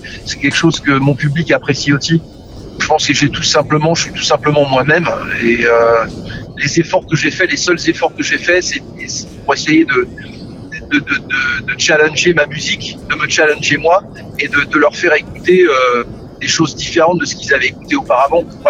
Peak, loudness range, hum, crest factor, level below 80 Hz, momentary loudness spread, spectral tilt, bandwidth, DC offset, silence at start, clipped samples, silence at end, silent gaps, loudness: 0 dBFS; 2 LU; none; 12 dB; -40 dBFS; 10 LU; -4 dB/octave; 9.8 kHz; under 0.1%; 0 s; under 0.1%; 0 s; none; -13 LUFS